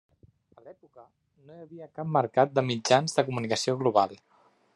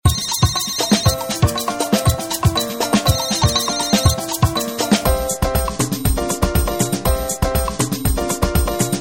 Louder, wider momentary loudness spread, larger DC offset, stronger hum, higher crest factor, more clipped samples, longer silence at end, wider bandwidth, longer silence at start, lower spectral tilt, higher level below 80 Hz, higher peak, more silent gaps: second, -26 LUFS vs -18 LUFS; first, 16 LU vs 4 LU; neither; neither; first, 24 dB vs 16 dB; neither; first, 0.6 s vs 0 s; second, 12 kHz vs 17 kHz; first, 0.65 s vs 0.05 s; about the same, -4.5 dB/octave vs -4 dB/octave; second, -74 dBFS vs -26 dBFS; second, -6 dBFS vs 0 dBFS; neither